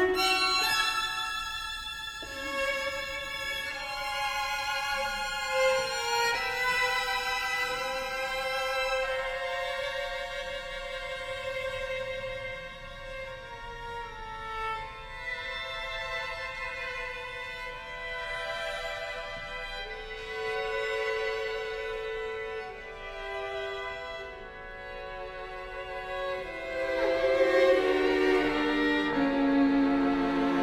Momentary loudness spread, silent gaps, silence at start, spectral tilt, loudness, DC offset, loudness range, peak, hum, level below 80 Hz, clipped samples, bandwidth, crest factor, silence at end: 14 LU; none; 0 s; -3 dB/octave; -30 LUFS; under 0.1%; 11 LU; -12 dBFS; none; -50 dBFS; under 0.1%; 18.5 kHz; 18 dB; 0 s